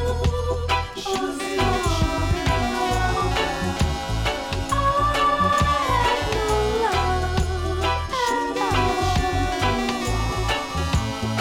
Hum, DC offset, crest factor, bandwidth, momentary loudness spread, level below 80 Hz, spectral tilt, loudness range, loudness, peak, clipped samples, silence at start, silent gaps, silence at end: none; under 0.1%; 14 dB; 17 kHz; 5 LU; -30 dBFS; -5 dB/octave; 2 LU; -22 LUFS; -8 dBFS; under 0.1%; 0 s; none; 0 s